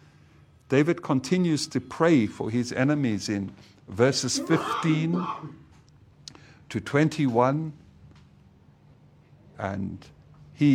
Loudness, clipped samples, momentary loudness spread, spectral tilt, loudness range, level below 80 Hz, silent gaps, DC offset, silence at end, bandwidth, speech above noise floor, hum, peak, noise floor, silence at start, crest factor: -25 LUFS; under 0.1%; 16 LU; -5.5 dB/octave; 4 LU; -62 dBFS; none; under 0.1%; 0 s; 14 kHz; 30 dB; none; -8 dBFS; -55 dBFS; 0.7 s; 20 dB